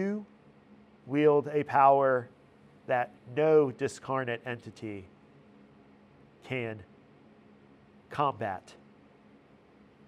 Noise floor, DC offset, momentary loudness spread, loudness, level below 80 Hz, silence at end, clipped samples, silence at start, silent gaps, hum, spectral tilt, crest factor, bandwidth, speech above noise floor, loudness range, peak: -59 dBFS; under 0.1%; 19 LU; -29 LUFS; -74 dBFS; 1.5 s; under 0.1%; 0 s; none; none; -7 dB/octave; 22 dB; 10.5 kHz; 31 dB; 16 LU; -10 dBFS